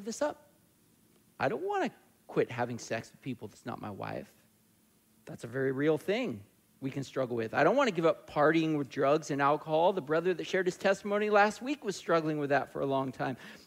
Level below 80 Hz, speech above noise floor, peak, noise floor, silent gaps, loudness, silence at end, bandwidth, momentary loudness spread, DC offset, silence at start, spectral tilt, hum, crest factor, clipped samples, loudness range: -72 dBFS; 36 dB; -14 dBFS; -67 dBFS; none; -31 LUFS; 0.1 s; 16 kHz; 14 LU; under 0.1%; 0 s; -5.5 dB/octave; none; 18 dB; under 0.1%; 9 LU